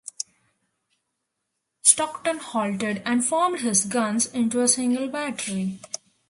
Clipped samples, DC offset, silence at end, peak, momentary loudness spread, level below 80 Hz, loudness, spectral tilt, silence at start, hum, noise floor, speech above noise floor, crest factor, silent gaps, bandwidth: under 0.1%; under 0.1%; 0.35 s; 0 dBFS; 14 LU; -68 dBFS; -22 LUFS; -3 dB/octave; 0.05 s; none; -80 dBFS; 55 dB; 26 dB; none; 11.5 kHz